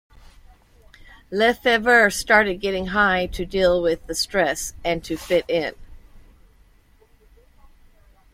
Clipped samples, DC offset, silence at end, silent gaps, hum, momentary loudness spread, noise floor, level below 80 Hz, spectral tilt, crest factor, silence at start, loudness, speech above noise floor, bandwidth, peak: under 0.1%; under 0.1%; 2.15 s; none; none; 10 LU; -55 dBFS; -44 dBFS; -3.5 dB/octave; 20 dB; 1.3 s; -20 LUFS; 35 dB; 16.5 kHz; -2 dBFS